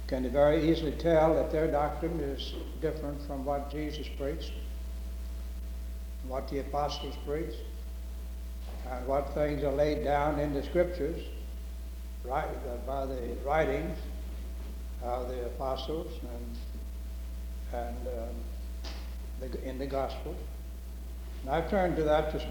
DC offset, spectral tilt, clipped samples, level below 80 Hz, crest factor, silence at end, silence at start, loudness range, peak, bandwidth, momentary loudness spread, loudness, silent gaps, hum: under 0.1%; -6.5 dB/octave; under 0.1%; -38 dBFS; 20 dB; 0 s; 0 s; 8 LU; -14 dBFS; over 20 kHz; 14 LU; -33 LUFS; none; none